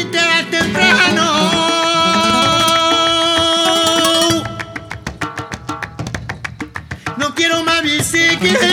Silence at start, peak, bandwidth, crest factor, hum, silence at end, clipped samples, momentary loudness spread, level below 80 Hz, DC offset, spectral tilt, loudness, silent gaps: 0 s; 0 dBFS; 19 kHz; 14 dB; none; 0 s; under 0.1%; 15 LU; -42 dBFS; under 0.1%; -2.5 dB/octave; -12 LUFS; none